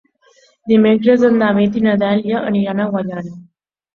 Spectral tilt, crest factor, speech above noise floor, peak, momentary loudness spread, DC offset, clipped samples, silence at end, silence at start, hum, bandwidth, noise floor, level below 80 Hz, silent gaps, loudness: -8.5 dB/octave; 14 dB; 39 dB; -2 dBFS; 13 LU; under 0.1%; under 0.1%; 0.55 s; 0.65 s; none; 6.4 kHz; -53 dBFS; -56 dBFS; none; -15 LUFS